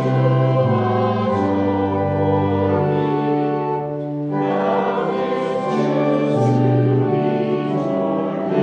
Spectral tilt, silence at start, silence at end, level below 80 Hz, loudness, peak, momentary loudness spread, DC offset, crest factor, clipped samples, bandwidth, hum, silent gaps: -9 dB/octave; 0 s; 0 s; -60 dBFS; -19 LUFS; -4 dBFS; 5 LU; under 0.1%; 14 dB; under 0.1%; 7.2 kHz; none; none